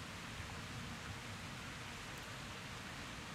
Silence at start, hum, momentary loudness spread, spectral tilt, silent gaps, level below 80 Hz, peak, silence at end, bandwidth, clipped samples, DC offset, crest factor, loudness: 0 s; none; 1 LU; -3.5 dB/octave; none; -60 dBFS; -34 dBFS; 0 s; 16 kHz; under 0.1%; under 0.1%; 14 dB; -47 LUFS